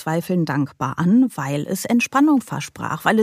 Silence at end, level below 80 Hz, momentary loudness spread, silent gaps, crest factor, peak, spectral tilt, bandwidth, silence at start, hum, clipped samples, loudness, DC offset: 0 s; -60 dBFS; 9 LU; none; 18 dB; -2 dBFS; -6 dB/octave; 15.5 kHz; 0 s; none; under 0.1%; -20 LUFS; under 0.1%